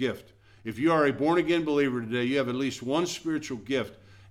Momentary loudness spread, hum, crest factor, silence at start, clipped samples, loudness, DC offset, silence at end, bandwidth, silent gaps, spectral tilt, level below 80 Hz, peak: 11 LU; none; 16 dB; 0 s; under 0.1%; -27 LUFS; under 0.1%; 0.15 s; 15 kHz; none; -5.5 dB/octave; -62 dBFS; -12 dBFS